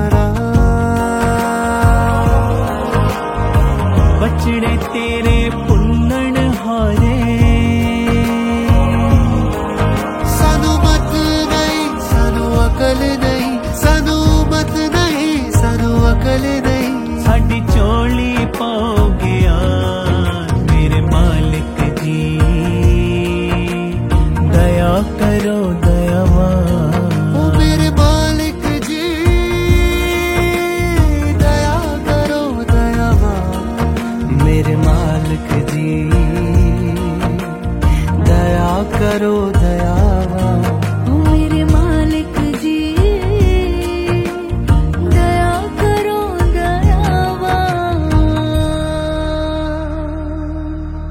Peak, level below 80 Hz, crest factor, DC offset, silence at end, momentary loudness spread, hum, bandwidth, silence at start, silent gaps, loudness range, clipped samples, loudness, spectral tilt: 0 dBFS; -18 dBFS; 12 dB; 0.2%; 0 s; 5 LU; none; 16.5 kHz; 0 s; none; 2 LU; under 0.1%; -14 LUFS; -6.5 dB/octave